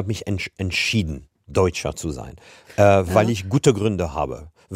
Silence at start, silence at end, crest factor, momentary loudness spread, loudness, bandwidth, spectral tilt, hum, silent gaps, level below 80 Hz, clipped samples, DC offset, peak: 0 s; 0 s; 20 dB; 15 LU; -21 LUFS; 16 kHz; -5.5 dB/octave; none; none; -42 dBFS; under 0.1%; under 0.1%; -2 dBFS